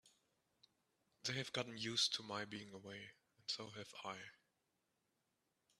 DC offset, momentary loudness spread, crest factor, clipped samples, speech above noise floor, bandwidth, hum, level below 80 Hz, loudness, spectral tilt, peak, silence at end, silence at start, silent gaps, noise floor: under 0.1%; 16 LU; 24 dB; under 0.1%; 40 dB; 14 kHz; none; -86 dBFS; -44 LUFS; -2.5 dB/octave; -24 dBFS; 1.45 s; 0.05 s; none; -86 dBFS